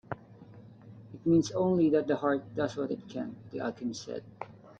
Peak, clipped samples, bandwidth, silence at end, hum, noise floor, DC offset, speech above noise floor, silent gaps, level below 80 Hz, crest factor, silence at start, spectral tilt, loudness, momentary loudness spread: -14 dBFS; under 0.1%; 8 kHz; 0.05 s; none; -52 dBFS; under 0.1%; 22 dB; none; -66 dBFS; 18 dB; 0.1 s; -6.5 dB/octave; -31 LUFS; 17 LU